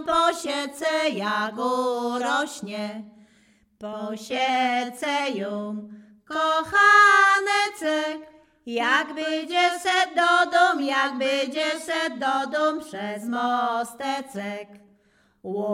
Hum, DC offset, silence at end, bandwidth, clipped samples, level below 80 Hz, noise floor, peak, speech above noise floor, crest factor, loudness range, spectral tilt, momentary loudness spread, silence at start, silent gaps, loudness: none; under 0.1%; 0 s; 16 kHz; under 0.1%; -68 dBFS; -63 dBFS; -6 dBFS; 39 dB; 18 dB; 8 LU; -2.5 dB/octave; 15 LU; 0 s; none; -23 LUFS